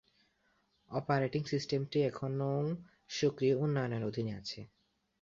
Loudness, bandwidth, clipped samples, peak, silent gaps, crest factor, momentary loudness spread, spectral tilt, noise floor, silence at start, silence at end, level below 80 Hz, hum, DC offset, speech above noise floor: -35 LUFS; 7.6 kHz; under 0.1%; -16 dBFS; none; 18 dB; 11 LU; -6.5 dB/octave; -75 dBFS; 0.9 s; 0.55 s; -68 dBFS; none; under 0.1%; 41 dB